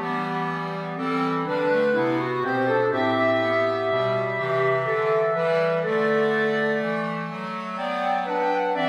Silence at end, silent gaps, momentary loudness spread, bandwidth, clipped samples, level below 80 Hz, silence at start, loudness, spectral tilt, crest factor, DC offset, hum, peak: 0 s; none; 7 LU; 10.5 kHz; under 0.1%; -70 dBFS; 0 s; -23 LUFS; -7 dB/octave; 14 dB; under 0.1%; none; -10 dBFS